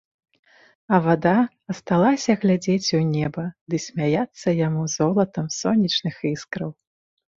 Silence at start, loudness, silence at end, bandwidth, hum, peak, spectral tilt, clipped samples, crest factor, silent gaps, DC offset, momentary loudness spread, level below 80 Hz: 0.9 s; -22 LUFS; 0.65 s; 7.8 kHz; none; -4 dBFS; -5.5 dB/octave; under 0.1%; 20 dB; 3.61-3.66 s; under 0.1%; 10 LU; -58 dBFS